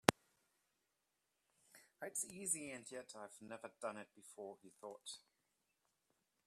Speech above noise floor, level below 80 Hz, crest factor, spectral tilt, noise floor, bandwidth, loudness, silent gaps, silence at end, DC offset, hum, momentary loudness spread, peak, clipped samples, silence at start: 37 dB; -80 dBFS; 44 dB; -3 dB/octave; -87 dBFS; 14.5 kHz; -47 LUFS; none; 1.3 s; under 0.1%; none; 15 LU; -4 dBFS; under 0.1%; 0.1 s